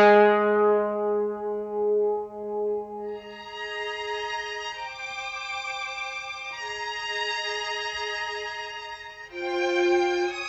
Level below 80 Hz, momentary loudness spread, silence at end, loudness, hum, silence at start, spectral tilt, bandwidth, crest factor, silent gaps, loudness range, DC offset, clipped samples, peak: -64 dBFS; 13 LU; 0 s; -27 LUFS; none; 0 s; -3.5 dB/octave; 8 kHz; 20 dB; none; 5 LU; under 0.1%; under 0.1%; -6 dBFS